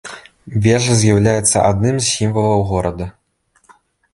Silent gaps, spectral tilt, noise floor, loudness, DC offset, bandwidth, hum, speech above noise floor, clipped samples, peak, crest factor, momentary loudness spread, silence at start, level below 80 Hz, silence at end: none; -5 dB/octave; -60 dBFS; -15 LUFS; under 0.1%; 11.5 kHz; none; 45 dB; under 0.1%; 0 dBFS; 16 dB; 16 LU; 0.05 s; -38 dBFS; 1.05 s